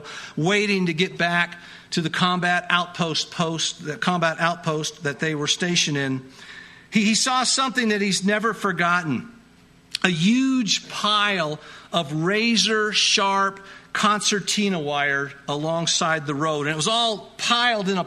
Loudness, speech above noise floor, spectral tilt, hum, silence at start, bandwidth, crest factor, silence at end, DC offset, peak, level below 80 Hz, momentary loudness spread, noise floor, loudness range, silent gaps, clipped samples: -21 LUFS; 30 dB; -3 dB/octave; none; 0 s; 13.5 kHz; 22 dB; 0 s; under 0.1%; 0 dBFS; -62 dBFS; 9 LU; -52 dBFS; 3 LU; none; under 0.1%